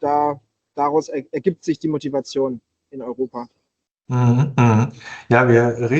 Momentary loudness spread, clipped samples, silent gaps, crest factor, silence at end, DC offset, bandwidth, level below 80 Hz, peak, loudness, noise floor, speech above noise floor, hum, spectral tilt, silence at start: 19 LU; under 0.1%; 3.91-3.95 s; 18 dB; 0 s; under 0.1%; 7.6 kHz; -56 dBFS; -2 dBFS; -19 LUFS; -73 dBFS; 55 dB; none; -7.5 dB/octave; 0 s